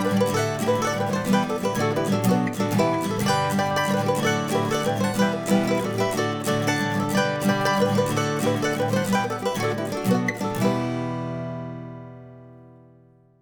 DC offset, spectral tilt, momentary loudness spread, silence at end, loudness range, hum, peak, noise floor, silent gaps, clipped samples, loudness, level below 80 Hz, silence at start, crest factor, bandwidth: under 0.1%; -5.5 dB/octave; 7 LU; 0.75 s; 4 LU; none; -8 dBFS; -55 dBFS; none; under 0.1%; -23 LUFS; -56 dBFS; 0 s; 16 dB; over 20 kHz